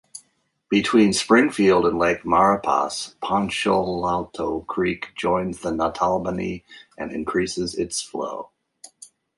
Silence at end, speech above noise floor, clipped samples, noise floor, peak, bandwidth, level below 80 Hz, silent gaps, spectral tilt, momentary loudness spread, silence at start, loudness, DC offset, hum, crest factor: 0.35 s; 44 dB; under 0.1%; -66 dBFS; -2 dBFS; 11.5 kHz; -50 dBFS; none; -4.5 dB/octave; 12 LU; 0.15 s; -22 LUFS; under 0.1%; none; 20 dB